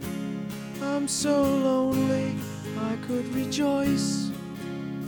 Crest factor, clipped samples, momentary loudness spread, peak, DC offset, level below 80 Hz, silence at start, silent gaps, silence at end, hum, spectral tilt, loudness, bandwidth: 14 dB; under 0.1%; 11 LU; -12 dBFS; under 0.1%; -56 dBFS; 0 s; none; 0 s; none; -5 dB/octave; -27 LUFS; 20 kHz